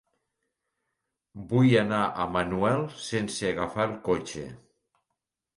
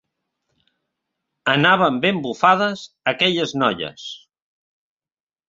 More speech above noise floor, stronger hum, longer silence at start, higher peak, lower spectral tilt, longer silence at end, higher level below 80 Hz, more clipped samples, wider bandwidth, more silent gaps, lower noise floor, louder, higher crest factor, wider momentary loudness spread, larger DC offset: second, 58 dB vs over 71 dB; neither; about the same, 1.35 s vs 1.45 s; second, -8 dBFS vs -2 dBFS; about the same, -6 dB/octave vs -5 dB/octave; second, 1 s vs 1.3 s; first, -56 dBFS vs -62 dBFS; neither; first, 11.5 kHz vs 7.8 kHz; neither; second, -84 dBFS vs under -90 dBFS; second, -27 LUFS vs -18 LUFS; about the same, 20 dB vs 20 dB; about the same, 14 LU vs 14 LU; neither